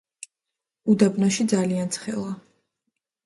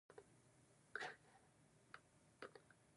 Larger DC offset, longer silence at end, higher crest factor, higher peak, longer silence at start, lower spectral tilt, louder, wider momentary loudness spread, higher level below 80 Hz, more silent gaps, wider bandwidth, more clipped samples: neither; first, 0.85 s vs 0 s; second, 20 dB vs 28 dB; first, -6 dBFS vs -34 dBFS; first, 0.85 s vs 0.1 s; first, -5.5 dB/octave vs -3 dB/octave; first, -23 LUFS vs -57 LUFS; first, 23 LU vs 15 LU; first, -66 dBFS vs -88 dBFS; neither; about the same, 11.5 kHz vs 11 kHz; neither